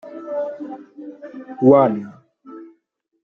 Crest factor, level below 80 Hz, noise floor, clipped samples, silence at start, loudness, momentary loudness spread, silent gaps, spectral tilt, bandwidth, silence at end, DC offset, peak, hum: 20 dB; -66 dBFS; -68 dBFS; under 0.1%; 0.05 s; -18 LUFS; 27 LU; none; -10.5 dB/octave; 3.9 kHz; 0.6 s; under 0.1%; -2 dBFS; none